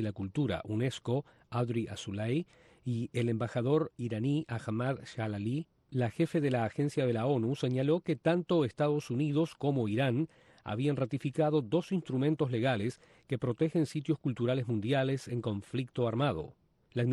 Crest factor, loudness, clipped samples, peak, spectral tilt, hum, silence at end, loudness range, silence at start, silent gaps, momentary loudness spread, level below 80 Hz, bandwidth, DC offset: 16 dB; -33 LUFS; under 0.1%; -16 dBFS; -7.5 dB/octave; none; 0 s; 3 LU; 0 s; none; 7 LU; -66 dBFS; 12 kHz; under 0.1%